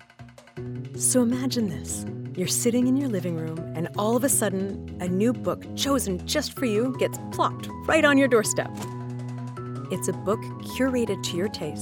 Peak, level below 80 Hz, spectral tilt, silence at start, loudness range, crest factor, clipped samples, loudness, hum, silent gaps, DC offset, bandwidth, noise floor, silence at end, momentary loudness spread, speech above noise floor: -6 dBFS; -56 dBFS; -4.5 dB/octave; 0.2 s; 3 LU; 20 dB; under 0.1%; -25 LUFS; none; none; under 0.1%; 18 kHz; -48 dBFS; 0 s; 13 LU; 23 dB